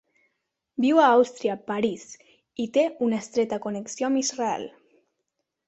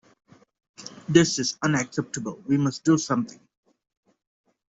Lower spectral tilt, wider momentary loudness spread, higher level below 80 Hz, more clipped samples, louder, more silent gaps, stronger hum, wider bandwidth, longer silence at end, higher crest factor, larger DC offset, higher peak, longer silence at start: about the same, -4 dB/octave vs -4.5 dB/octave; about the same, 18 LU vs 17 LU; second, -70 dBFS vs -64 dBFS; neither; about the same, -24 LUFS vs -24 LUFS; neither; neither; about the same, 8.2 kHz vs 8 kHz; second, 1 s vs 1.4 s; about the same, 20 dB vs 24 dB; neither; about the same, -6 dBFS vs -4 dBFS; about the same, 0.8 s vs 0.8 s